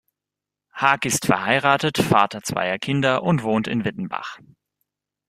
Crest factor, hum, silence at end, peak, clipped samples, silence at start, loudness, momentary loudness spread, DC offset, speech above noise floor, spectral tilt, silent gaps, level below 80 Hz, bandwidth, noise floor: 20 dB; 50 Hz at -50 dBFS; 0.9 s; -2 dBFS; under 0.1%; 0.75 s; -21 LUFS; 11 LU; under 0.1%; 65 dB; -4.5 dB/octave; none; -56 dBFS; 15.5 kHz; -86 dBFS